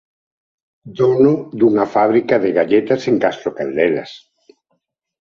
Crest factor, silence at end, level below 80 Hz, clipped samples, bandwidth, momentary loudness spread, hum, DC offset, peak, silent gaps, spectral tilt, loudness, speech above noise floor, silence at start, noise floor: 16 dB; 1.05 s; -58 dBFS; under 0.1%; 7.2 kHz; 9 LU; none; under 0.1%; -2 dBFS; none; -7.5 dB/octave; -16 LUFS; 54 dB; 0.85 s; -70 dBFS